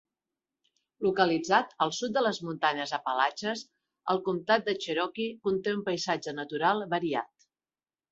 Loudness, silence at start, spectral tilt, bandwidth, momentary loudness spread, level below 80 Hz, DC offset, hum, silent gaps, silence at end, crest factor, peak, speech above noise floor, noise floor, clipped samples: -29 LUFS; 1 s; -4 dB/octave; 8 kHz; 8 LU; -74 dBFS; under 0.1%; none; none; 0.85 s; 22 dB; -8 dBFS; over 61 dB; under -90 dBFS; under 0.1%